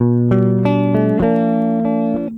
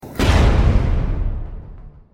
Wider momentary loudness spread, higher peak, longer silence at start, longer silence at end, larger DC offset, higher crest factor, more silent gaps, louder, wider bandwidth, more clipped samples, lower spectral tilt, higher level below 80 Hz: second, 3 LU vs 18 LU; about the same, -2 dBFS vs -4 dBFS; about the same, 0 s vs 0.05 s; second, 0 s vs 0.25 s; neither; about the same, 12 dB vs 14 dB; neither; first, -15 LUFS vs -18 LUFS; second, 4.3 kHz vs 16 kHz; neither; first, -11 dB/octave vs -6.5 dB/octave; second, -42 dBFS vs -20 dBFS